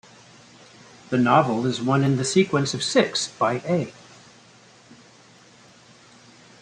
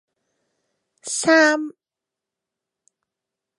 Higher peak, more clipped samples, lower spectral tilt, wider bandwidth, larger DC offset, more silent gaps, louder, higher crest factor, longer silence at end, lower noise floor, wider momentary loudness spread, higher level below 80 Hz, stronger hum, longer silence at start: about the same, -4 dBFS vs -4 dBFS; neither; first, -5 dB/octave vs -2 dB/octave; about the same, 10.5 kHz vs 11.5 kHz; neither; neither; second, -22 LUFS vs -18 LUFS; about the same, 22 dB vs 22 dB; first, 2.7 s vs 1.85 s; second, -52 dBFS vs -87 dBFS; second, 7 LU vs 20 LU; first, -64 dBFS vs -74 dBFS; neither; about the same, 1.1 s vs 1.05 s